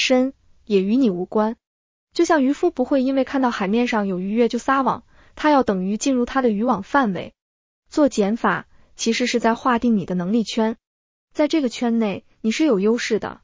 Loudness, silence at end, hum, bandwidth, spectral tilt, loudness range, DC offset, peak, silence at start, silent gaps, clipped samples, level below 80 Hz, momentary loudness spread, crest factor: -20 LUFS; 0.1 s; none; 7.6 kHz; -5 dB/octave; 1 LU; under 0.1%; -4 dBFS; 0 s; 1.67-2.07 s, 7.42-7.83 s, 10.87-11.28 s; under 0.1%; -54 dBFS; 8 LU; 16 dB